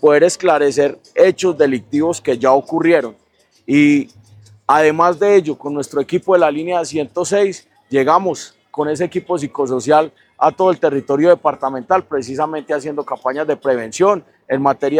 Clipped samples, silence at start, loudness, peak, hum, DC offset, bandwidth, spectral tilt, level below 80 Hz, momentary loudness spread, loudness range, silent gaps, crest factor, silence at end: under 0.1%; 0 s; -16 LUFS; 0 dBFS; none; under 0.1%; 13 kHz; -5 dB/octave; -62 dBFS; 10 LU; 3 LU; none; 16 dB; 0 s